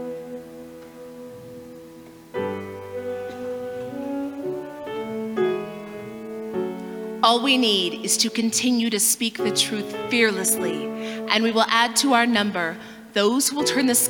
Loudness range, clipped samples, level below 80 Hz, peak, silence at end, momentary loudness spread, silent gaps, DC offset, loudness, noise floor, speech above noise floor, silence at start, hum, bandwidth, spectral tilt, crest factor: 13 LU; under 0.1%; -66 dBFS; -4 dBFS; 0 s; 21 LU; none; under 0.1%; -22 LUFS; -44 dBFS; 22 dB; 0 s; none; 20 kHz; -2 dB/octave; 20 dB